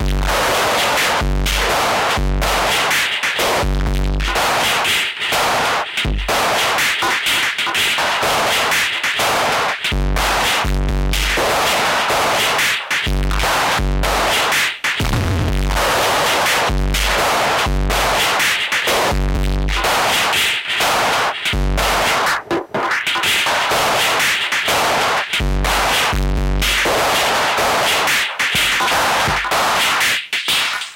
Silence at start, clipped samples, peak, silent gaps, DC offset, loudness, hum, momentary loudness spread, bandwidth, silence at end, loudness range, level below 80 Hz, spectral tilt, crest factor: 0 s; under 0.1%; -4 dBFS; none; under 0.1%; -16 LUFS; none; 4 LU; 17 kHz; 0 s; 1 LU; -24 dBFS; -2.5 dB/octave; 12 dB